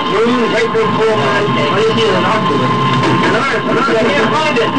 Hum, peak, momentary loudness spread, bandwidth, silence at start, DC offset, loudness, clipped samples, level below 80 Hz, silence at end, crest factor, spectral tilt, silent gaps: none; -2 dBFS; 1 LU; 9.8 kHz; 0 s; 3%; -12 LUFS; under 0.1%; -46 dBFS; 0 s; 10 dB; -5.5 dB/octave; none